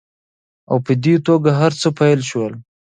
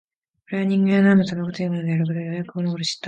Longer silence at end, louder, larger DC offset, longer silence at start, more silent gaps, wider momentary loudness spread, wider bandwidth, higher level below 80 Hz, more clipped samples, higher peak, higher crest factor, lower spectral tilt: first, 0.35 s vs 0 s; first, -16 LUFS vs -21 LUFS; neither; first, 0.7 s vs 0.5 s; neither; second, 8 LU vs 11 LU; about the same, 9.6 kHz vs 9 kHz; about the same, -60 dBFS vs -64 dBFS; neither; first, 0 dBFS vs -6 dBFS; about the same, 16 dB vs 14 dB; about the same, -6.5 dB/octave vs -6.5 dB/octave